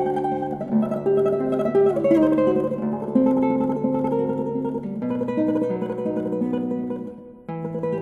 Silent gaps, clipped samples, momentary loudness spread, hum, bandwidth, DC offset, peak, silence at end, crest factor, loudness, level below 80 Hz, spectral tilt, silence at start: none; under 0.1%; 9 LU; none; 6.8 kHz; under 0.1%; -8 dBFS; 0 s; 14 dB; -23 LUFS; -56 dBFS; -9.5 dB/octave; 0 s